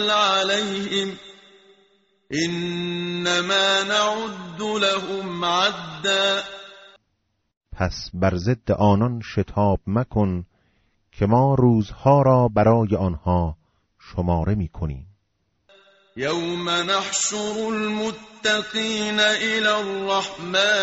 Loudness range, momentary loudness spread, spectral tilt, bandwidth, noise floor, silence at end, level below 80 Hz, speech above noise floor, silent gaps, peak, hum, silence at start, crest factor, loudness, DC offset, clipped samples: 6 LU; 11 LU; -3.5 dB/octave; 8 kHz; -72 dBFS; 0 s; -44 dBFS; 51 dB; 7.57-7.61 s; -4 dBFS; none; 0 s; 18 dB; -21 LUFS; under 0.1%; under 0.1%